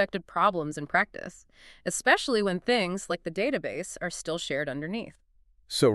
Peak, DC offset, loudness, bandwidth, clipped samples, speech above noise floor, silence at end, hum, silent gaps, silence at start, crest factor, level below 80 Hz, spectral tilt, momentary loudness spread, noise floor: -6 dBFS; under 0.1%; -28 LUFS; 13.5 kHz; under 0.1%; 25 dB; 0 s; none; none; 0 s; 22 dB; -58 dBFS; -4 dB/octave; 12 LU; -54 dBFS